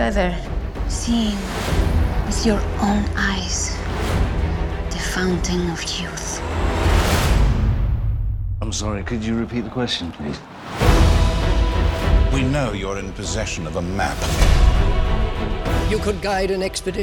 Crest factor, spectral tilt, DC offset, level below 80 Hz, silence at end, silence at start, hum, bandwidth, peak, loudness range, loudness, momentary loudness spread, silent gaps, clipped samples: 18 dB; -5 dB/octave; under 0.1%; -22 dBFS; 0 s; 0 s; none; 18 kHz; -2 dBFS; 3 LU; -21 LUFS; 8 LU; none; under 0.1%